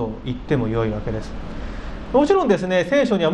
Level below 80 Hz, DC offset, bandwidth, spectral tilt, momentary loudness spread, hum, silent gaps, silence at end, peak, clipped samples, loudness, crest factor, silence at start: -34 dBFS; under 0.1%; 10 kHz; -7 dB/octave; 16 LU; none; none; 0 s; -2 dBFS; under 0.1%; -20 LUFS; 18 dB; 0 s